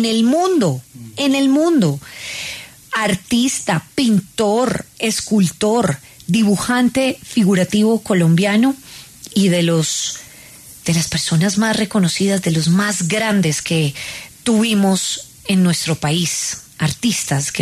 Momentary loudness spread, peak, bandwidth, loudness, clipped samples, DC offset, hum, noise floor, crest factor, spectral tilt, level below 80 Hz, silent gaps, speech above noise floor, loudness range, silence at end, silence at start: 11 LU; -4 dBFS; 13.5 kHz; -17 LUFS; under 0.1%; under 0.1%; none; -40 dBFS; 14 dB; -4.5 dB/octave; -50 dBFS; none; 24 dB; 2 LU; 0 s; 0 s